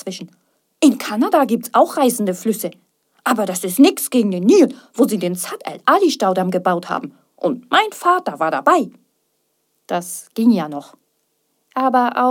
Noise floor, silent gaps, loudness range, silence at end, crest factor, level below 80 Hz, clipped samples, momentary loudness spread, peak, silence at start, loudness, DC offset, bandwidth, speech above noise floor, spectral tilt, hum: -68 dBFS; none; 5 LU; 0 s; 18 dB; -74 dBFS; under 0.1%; 12 LU; 0 dBFS; 0.05 s; -17 LUFS; under 0.1%; 17.5 kHz; 51 dB; -4.5 dB/octave; none